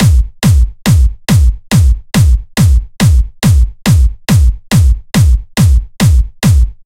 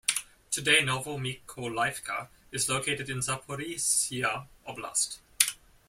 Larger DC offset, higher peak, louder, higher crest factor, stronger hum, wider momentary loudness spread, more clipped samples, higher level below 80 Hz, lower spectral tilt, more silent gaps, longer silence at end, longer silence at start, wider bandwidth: first, 0.4% vs under 0.1%; about the same, 0 dBFS vs 0 dBFS; first, -11 LUFS vs -29 LUFS; second, 8 dB vs 30 dB; neither; second, 1 LU vs 13 LU; neither; first, -12 dBFS vs -62 dBFS; first, -5.5 dB/octave vs -1.5 dB/octave; neither; second, 0.15 s vs 0.35 s; about the same, 0 s vs 0.1 s; about the same, 16.5 kHz vs 16.5 kHz